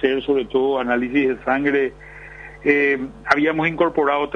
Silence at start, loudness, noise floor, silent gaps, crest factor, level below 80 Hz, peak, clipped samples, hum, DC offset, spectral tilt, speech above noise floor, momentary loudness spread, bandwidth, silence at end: 0 s; -19 LUFS; -39 dBFS; none; 18 dB; -48 dBFS; -2 dBFS; under 0.1%; 50 Hz at -45 dBFS; under 0.1%; -6.5 dB/octave; 19 dB; 10 LU; 7 kHz; 0 s